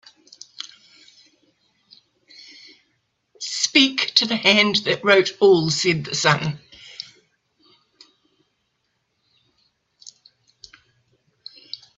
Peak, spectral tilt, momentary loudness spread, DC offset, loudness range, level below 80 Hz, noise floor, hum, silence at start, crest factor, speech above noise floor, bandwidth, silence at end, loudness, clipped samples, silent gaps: 0 dBFS; -3.5 dB/octave; 23 LU; under 0.1%; 10 LU; -66 dBFS; -72 dBFS; none; 0.65 s; 24 dB; 54 dB; 8.2 kHz; 0.2 s; -17 LUFS; under 0.1%; none